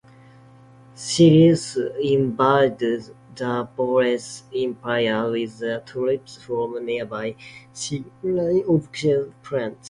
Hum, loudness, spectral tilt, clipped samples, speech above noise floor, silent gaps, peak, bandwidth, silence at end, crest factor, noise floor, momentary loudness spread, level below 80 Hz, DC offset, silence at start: none; -22 LUFS; -6 dB/octave; under 0.1%; 27 dB; none; -4 dBFS; 11.5 kHz; 0 s; 18 dB; -48 dBFS; 13 LU; -58 dBFS; under 0.1%; 0.95 s